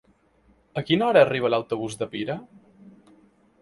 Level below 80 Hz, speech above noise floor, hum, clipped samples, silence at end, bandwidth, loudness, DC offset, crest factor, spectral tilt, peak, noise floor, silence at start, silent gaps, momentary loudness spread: -62 dBFS; 38 dB; none; under 0.1%; 1.15 s; 11.5 kHz; -23 LUFS; under 0.1%; 22 dB; -5.5 dB/octave; -4 dBFS; -61 dBFS; 0.75 s; none; 15 LU